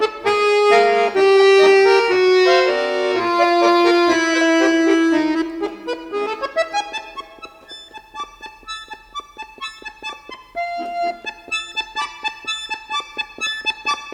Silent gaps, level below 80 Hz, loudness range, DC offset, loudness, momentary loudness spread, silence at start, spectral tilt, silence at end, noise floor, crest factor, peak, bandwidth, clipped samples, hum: none; -56 dBFS; 16 LU; under 0.1%; -17 LUFS; 20 LU; 0 s; -2.5 dB/octave; 0 s; -40 dBFS; 16 dB; -2 dBFS; 11 kHz; under 0.1%; none